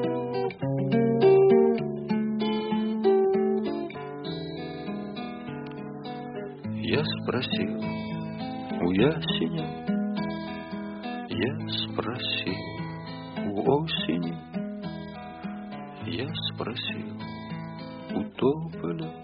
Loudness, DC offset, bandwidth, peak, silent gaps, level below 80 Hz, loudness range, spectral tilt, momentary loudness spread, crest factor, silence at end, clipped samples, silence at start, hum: -28 LUFS; under 0.1%; 5.2 kHz; -8 dBFS; none; -60 dBFS; 10 LU; -5 dB/octave; 14 LU; 18 dB; 0 s; under 0.1%; 0 s; none